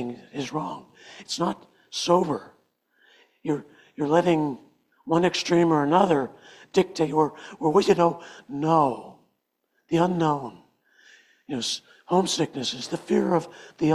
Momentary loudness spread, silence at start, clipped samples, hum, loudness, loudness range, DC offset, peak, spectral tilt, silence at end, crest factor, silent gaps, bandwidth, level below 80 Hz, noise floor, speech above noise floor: 15 LU; 0 s; under 0.1%; none; -24 LUFS; 6 LU; under 0.1%; -6 dBFS; -5.5 dB/octave; 0 s; 20 dB; none; 13 kHz; -66 dBFS; -74 dBFS; 50 dB